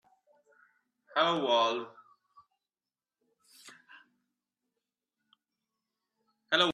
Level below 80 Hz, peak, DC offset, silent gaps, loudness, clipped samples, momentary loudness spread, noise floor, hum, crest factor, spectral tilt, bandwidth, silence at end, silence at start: -86 dBFS; -12 dBFS; under 0.1%; none; -29 LUFS; under 0.1%; 26 LU; under -90 dBFS; none; 24 dB; -3.5 dB/octave; 13.5 kHz; 0 s; 1.15 s